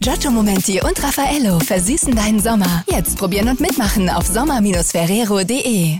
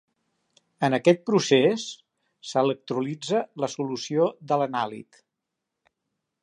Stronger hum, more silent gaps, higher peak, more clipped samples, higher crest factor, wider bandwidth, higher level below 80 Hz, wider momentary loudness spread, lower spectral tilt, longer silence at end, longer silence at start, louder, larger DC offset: neither; neither; about the same, -6 dBFS vs -6 dBFS; neither; second, 8 dB vs 20 dB; first, 17.5 kHz vs 10.5 kHz; first, -28 dBFS vs -78 dBFS; second, 2 LU vs 12 LU; about the same, -4.5 dB/octave vs -5 dB/octave; second, 0 s vs 1.4 s; second, 0 s vs 0.8 s; first, -16 LUFS vs -25 LUFS; first, 0.3% vs under 0.1%